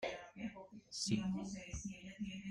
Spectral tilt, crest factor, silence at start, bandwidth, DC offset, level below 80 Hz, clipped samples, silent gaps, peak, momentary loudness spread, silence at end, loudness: -4.5 dB/octave; 20 dB; 0 s; 11 kHz; under 0.1%; -62 dBFS; under 0.1%; none; -24 dBFS; 11 LU; 0 s; -44 LUFS